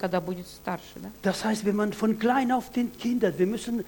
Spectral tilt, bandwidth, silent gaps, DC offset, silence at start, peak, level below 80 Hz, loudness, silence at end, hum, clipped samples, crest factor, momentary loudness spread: -5.5 dB/octave; 17.5 kHz; none; under 0.1%; 0 s; -10 dBFS; -56 dBFS; -27 LUFS; 0 s; none; under 0.1%; 16 dB; 11 LU